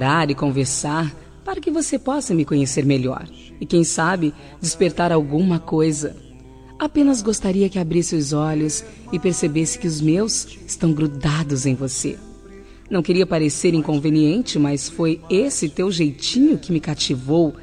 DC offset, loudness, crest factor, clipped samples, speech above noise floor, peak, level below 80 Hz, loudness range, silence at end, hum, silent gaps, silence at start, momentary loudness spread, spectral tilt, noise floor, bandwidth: under 0.1%; -20 LUFS; 14 dB; under 0.1%; 22 dB; -4 dBFS; -44 dBFS; 2 LU; 0 s; none; none; 0 s; 8 LU; -5 dB/octave; -41 dBFS; 13.5 kHz